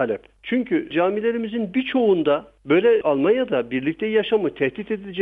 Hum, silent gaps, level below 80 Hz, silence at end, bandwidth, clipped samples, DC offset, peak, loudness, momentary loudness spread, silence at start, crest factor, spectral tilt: none; none; -58 dBFS; 0 s; 3.9 kHz; under 0.1%; under 0.1%; -6 dBFS; -21 LUFS; 7 LU; 0 s; 14 dB; -8.5 dB/octave